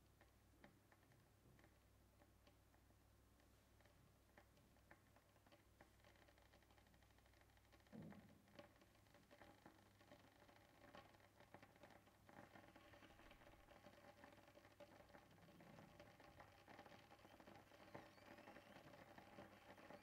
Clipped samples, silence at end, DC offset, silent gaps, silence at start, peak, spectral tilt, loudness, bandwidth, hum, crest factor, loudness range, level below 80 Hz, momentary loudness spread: under 0.1%; 0 s; under 0.1%; none; 0 s; -46 dBFS; -5 dB/octave; -67 LUFS; 15.5 kHz; none; 24 dB; 4 LU; -82 dBFS; 5 LU